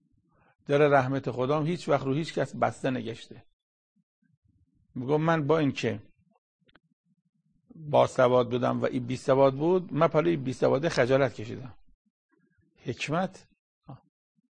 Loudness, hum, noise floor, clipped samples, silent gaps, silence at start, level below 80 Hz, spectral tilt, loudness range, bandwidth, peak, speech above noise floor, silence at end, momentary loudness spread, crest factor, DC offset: -26 LUFS; none; -68 dBFS; under 0.1%; 3.53-3.96 s, 4.03-4.22 s, 4.37-4.42 s, 6.38-6.59 s, 6.93-7.04 s, 7.29-7.33 s, 11.94-12.29 s, 13.59-13.81 s; 0.7 s; -64 dBFS; -6.5 dB/octave; 7 LU; 9.8 kHz; -8 dBFS; 42 dB; 0.55 s; 17 LU; 20 dB; under 0.1%